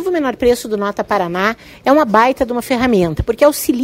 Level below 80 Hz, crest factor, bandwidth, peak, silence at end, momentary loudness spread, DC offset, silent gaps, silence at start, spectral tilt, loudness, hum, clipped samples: -36 dBFS; 14 dB; 16.5 kHz; 0 dBFS; 0 s; 7 LU; under 0.1%; none; 0 s; -5 dB/octave; -15 LUFS; none; under 0.1%